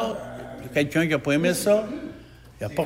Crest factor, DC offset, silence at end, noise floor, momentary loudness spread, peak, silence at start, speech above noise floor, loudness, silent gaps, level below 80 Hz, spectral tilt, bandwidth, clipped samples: 16 dB; under 0.1%; 0 s; -46 dBFS; 15 LU; -8 dBFS; 0 s; 23 dB; -24 LUFS; none; -52 dBFS; -5 dB/octave; 16 kHz; under 0.1%